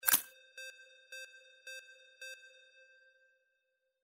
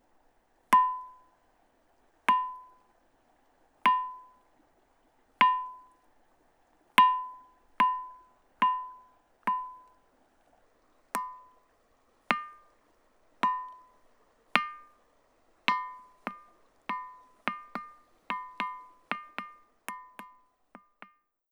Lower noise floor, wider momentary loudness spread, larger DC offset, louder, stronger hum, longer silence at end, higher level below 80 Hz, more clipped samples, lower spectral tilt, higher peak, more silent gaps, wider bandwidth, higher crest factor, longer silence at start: first, -83 dBFS vs -68 dBFS; about the same, 22 LU vs 23 LU; neither; second, -40 LUFS vs -30 LUFS; neither; first, 1.55 s vs 1.25 s; second, -80 dBFS vs -74 dBFS; neither; second, 1.5 dB/octave vs -2.5 dB/octave; second, -6 dBFS vs 0 dBFS; neither; second, 16 kHz vs over 20 kHz; about the same, 36 dB vs 34 dB; second, 0.05 s vs 0.7 s